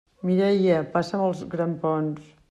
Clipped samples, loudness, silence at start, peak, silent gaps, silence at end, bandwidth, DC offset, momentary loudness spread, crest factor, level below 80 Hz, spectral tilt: under 0.1%; -24 LUFS; 0.25 s; -8 dBFS; none; 0.3 s; 9.2 kHz; under 0.1%; 8 LU; 16 dB; -62 dBFS; -8 dB/octave